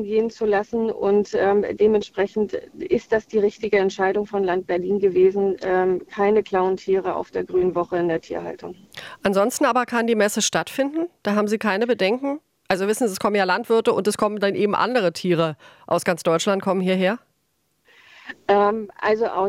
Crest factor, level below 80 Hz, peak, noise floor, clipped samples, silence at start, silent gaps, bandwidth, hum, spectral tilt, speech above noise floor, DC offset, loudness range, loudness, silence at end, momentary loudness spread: 18 dB; -58 dBFS; -4 dBFS; -70 dBFS; under 0.1%; 0 s; none; 16 kHz; none; -4.5 dB/octave; 49 dB; under 0.1%; 2 LU; -21 LUFS; 0 s; 7 LU